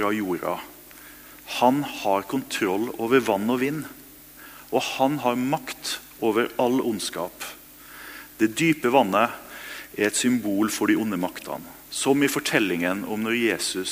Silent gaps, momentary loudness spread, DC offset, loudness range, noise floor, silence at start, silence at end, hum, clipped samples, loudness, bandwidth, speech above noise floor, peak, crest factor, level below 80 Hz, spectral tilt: none; 19 LU; under 0.1%; 3 LU; -46 dBFS; 0 s; 0 s; none; under 0.1%; -24 LUFS; 16 kHz; 22 dB; -2 dBFS; 22 dB; -62 dBFS; -4 dB/octave